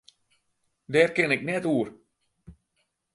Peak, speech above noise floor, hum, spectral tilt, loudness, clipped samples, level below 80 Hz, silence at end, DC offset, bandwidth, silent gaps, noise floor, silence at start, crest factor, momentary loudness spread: -6 dBFS; 52 dB; none; -5.5 dB/octave; -25 LUFS; under 0.1%; -64 dBFS; 0.65 s; under 0.1%; 11.5 kHz; none; -76 dBFS; 0.9 s; 22 dB; 7 LU